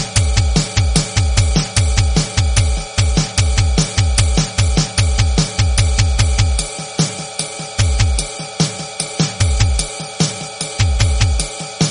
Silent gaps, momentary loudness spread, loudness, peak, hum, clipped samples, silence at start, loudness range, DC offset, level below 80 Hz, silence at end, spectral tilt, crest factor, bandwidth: none; 6 LU; -16 LUFS; 0 dBFS; none; under 0.1%; 0 s; 3 LU; under 0.1%; -20 dBFS; 0 s; -4 dB/octave; 16 dB; 11 kHz